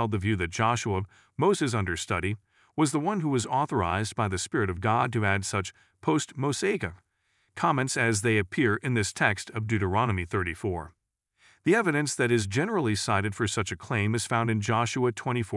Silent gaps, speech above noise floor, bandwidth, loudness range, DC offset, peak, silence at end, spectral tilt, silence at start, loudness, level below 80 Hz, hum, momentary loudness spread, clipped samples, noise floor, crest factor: none; 45 dB; 12 kHz; 2 LU; under 0.1%; -8 dBFS; 0 s; -5 dB/octave; 0 s; -27 LUFS; -60 dBFS; none; 7 LU; under 0.1%; -72 dBFS; 20 dB